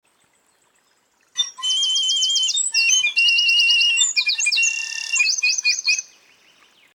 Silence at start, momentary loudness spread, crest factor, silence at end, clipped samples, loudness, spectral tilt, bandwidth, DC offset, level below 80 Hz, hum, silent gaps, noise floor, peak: 1.35 s; 8 LU; 16 dB; 0.95 s; under 0.1%; -16 LUFS; 7 dB/octave; 19 kHz; under 0.1%; -84 dBFS; none; none; -62 dBFS; -6 dBFS